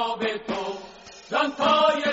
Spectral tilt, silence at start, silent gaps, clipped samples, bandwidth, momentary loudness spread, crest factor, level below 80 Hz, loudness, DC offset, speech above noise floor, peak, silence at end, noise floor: -1 dB/octave; 0 s; none; under 0.1%; 8 kHz; 20 LU; 16 dB; -62 dBFS; -24 LUFS; under 0.1%; 22 dB; -8 dBFS; 0 s; -44 dBFS